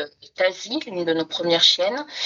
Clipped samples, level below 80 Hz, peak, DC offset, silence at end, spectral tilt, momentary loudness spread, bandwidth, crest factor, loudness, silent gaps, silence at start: under 0.1%; -72 dBFS; -2 dBFS; under 0.1%; 0 s; -2.5 dB/octave; 12 LU; 7.8 kHz; 20 dB; -20 LUFS; none; 0 s